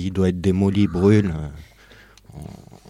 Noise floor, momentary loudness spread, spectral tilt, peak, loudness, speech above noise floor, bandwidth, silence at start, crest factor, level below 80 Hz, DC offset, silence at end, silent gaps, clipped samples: -49 dBFS; 22 LU; -8 dB/octave; -4 dBFS; -19 LUFS; 29 dB; 11.5 kHz; 0 s; 18 dB; -42 dBFS; under 0.1%; 0.35 s; none; under 0.1%